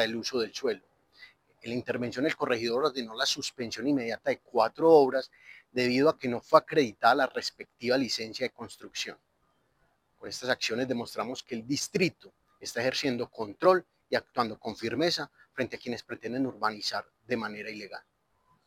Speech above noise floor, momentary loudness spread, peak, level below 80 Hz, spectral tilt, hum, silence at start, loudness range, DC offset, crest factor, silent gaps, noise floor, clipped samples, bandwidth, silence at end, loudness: 43 dB; 13 LU; -6 dBFS; -72 dBFS; -4 dB/octave; none; 0 s; 8 LU; under 0.1%; 24 dB; none; -72 dBFS; under 0.1%; 16 kHz; 0.65 s; -29 LUFS